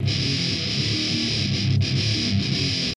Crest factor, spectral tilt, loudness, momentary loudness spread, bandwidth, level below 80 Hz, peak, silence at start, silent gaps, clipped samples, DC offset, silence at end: 14 dB; -4.5 dB/octave; -22 LUFS; 1 LU; 11 kHz; -46 dBFS; -10 dBFS; 0 s; none; under 0.1%; under 0.1%; 0 s